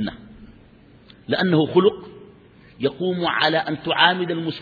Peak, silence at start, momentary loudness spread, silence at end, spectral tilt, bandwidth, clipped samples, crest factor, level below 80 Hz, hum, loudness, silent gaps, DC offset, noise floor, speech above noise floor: -2 dBFS; 0 s; 10 LU; 0 s; -7.5 dB/octave; 4.9 kHz; under 0.1%; 22 dB; -56 dBFS; none; -20 LUFS; none; under 0.1%; -49 dBFS; 29 dB